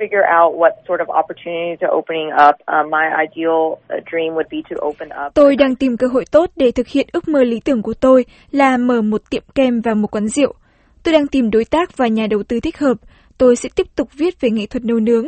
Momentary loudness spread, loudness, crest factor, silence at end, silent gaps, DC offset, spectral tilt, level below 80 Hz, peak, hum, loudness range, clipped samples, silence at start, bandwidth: 10 LU; -16 LUFS; 16 dB; 0 s; none; under 0.1%; -5.5 dB/octave; -46 dBFS; 0 dBFS; none; 2 LU; under 0.1%; 0 s; 8.8 kHz